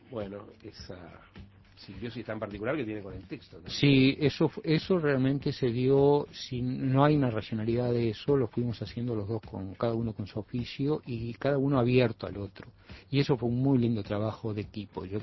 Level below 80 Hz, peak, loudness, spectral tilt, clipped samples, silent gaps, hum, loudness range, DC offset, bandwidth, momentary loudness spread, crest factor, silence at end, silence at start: -54 dBFS; -8 dBFS; -29 LUFS; -8 dB/octave; under 0.1%; none; none; 6 LU; under 0.1%; 6 kHz; 18 LU; 20 dB; 0 s; 0.1 s